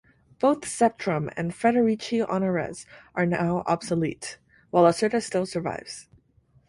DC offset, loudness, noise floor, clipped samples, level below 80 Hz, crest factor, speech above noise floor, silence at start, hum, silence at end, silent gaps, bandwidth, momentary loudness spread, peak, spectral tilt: under 0.1%; -25 LUFS; -62 dBFS; under 0.1%; -60 dBFS; 20 dB; 37 dB; 0.4 s; none; 0.65 s; none; 11.5 kHz; 15 LU; -6 dBFS; -5.5 dB/octave